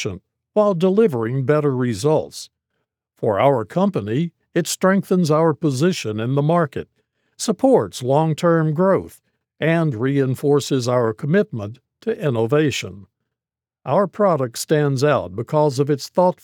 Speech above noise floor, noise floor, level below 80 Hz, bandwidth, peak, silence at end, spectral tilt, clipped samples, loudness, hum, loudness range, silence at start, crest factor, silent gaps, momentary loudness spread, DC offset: 71 dB; -89 dBFS; -66 dBFS; 19 kHz; -2 dBFS; 0.1 s; -6.5 dB/octave; under 0.1%; -19 LUFS; none; 2 LU; 0 s; 16 dB; none; 9 LU; under 0.1%